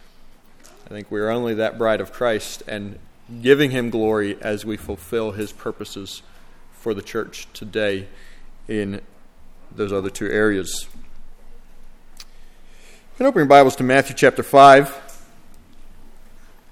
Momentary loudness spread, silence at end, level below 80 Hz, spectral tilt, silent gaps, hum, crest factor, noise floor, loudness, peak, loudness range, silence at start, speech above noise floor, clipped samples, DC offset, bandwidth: 21 LU; 0.6 s; -42 dBFS; -5 dB/octave; none; none; 20 dB; -45 dBFS; -18 LUFS; 0 dBFS; 13 LU; 0.9 s; 27 dB; under 0.1%; under 0.1%; 16 kHz